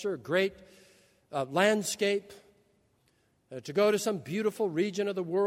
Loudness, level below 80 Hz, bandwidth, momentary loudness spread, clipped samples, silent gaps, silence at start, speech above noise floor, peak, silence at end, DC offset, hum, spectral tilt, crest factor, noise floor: -30 LUFS; -74 dBFS; 16 kHz; 9 LU; under 0.1%; none; 0 s; 41 dB; -10 dBFS; 0 s; under 0.1%; none; -4.5 dB/octave; 20 dB; -70 dBFS